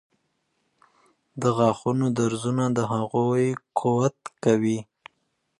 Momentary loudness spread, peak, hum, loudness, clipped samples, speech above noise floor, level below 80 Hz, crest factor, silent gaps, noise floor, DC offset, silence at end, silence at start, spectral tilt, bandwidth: 5 LU; -6 dBFS; none; -24 LUFS; under 0.1%; 51 dB; -64 dBFS; 18 dB; none; -74 dBFS; under 0.1%; 0.75 s; 1.35 s; -7 dB/octave; 11.5 kHz